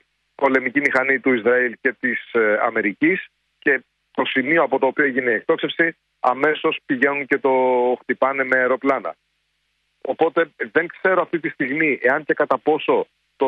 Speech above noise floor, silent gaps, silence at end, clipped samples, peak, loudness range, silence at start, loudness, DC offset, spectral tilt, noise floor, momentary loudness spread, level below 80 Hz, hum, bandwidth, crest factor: 51 dB; none; 0 s; under 0.1%; -4 dBFS; 2 LU; 0.4 s; -19 LUFS; under 0.1%; -6.5 dB/octave; -70 dBFS; 6 LU; -70 dBFS; none; 7 kHz; 16 dB